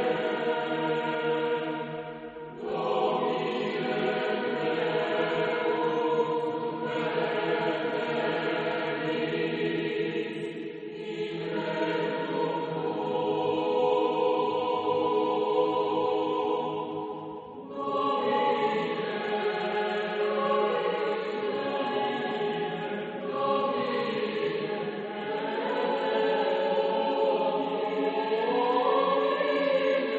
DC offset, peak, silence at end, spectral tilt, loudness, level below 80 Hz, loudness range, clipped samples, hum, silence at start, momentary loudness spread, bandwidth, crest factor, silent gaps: under 0.1%; -14 dBFS; 0 s; -6.5 dB/octave; -28 LUFS; -74 dBFS; 4 LU; under 0.1%; none; 0 s; 8 LU; 7.8 kHz; 14 dB; none